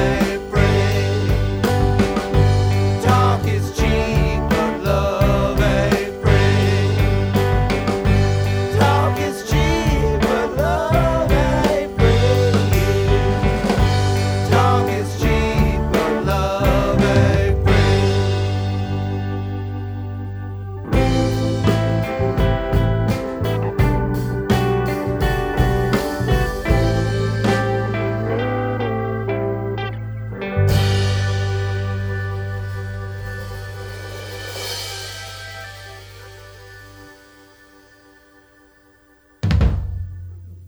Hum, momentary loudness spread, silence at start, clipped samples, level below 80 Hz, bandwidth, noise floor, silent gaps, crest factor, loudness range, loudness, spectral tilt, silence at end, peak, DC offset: none; 13 LU; 0 s; under 0.1%; -26 dBFS; over 20 kHz; -53 dBFS; none; 18 dB; 10 LU; -19 LUFS; -6.5 dB/octave; 0 s; 0 dBFS; under 0.1%